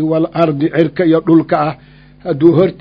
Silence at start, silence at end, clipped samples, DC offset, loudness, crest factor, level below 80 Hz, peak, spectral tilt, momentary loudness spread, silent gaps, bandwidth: 0 s; 0.1 s; 0.2%; under 0.1%; -13 LUFS; 12 dB; -48 dBFS; 0 dBFS; -10 dB/octave; 11 LU; none; 5.2 kHz